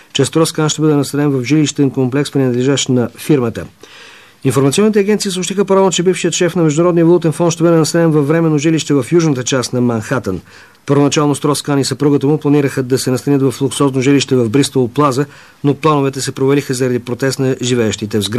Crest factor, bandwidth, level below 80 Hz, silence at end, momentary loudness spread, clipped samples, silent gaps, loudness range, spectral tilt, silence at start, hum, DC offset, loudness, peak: 12 dB; 14 kHz; -54 dBFS; 0 s; 6 LU; under 0.1%; none; 3 LU; -5.5 dB/octave; 0.15 s; none; 0.2%; -13 LUFS; -2 dBFS